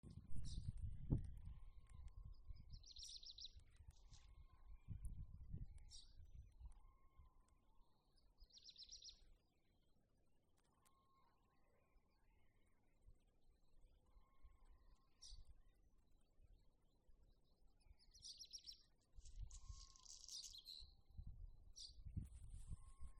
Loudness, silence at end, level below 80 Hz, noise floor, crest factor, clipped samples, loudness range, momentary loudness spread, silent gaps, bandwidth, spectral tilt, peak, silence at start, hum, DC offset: -58 LUFS; 0 s; -62 dBFS; -80 dBFS; 30 dB; under 0.1%; 11 LU; 13 LU; none; 11 kHz; -4.5 dB/octave; -26 dBFS; 0.05 s; none; under 0.1%